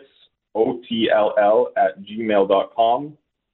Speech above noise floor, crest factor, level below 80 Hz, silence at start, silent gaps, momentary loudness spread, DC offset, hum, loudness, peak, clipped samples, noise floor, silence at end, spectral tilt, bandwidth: 39 dB; 16 dB; -64 dBFS; 0.55 s; none; 9 LU; under 0.1%; none; -19 LUFS; -4 dBFS; under 0.1%; -57 dBFS; 0.4 s; -9.5 dB/octave; 4.1 kHz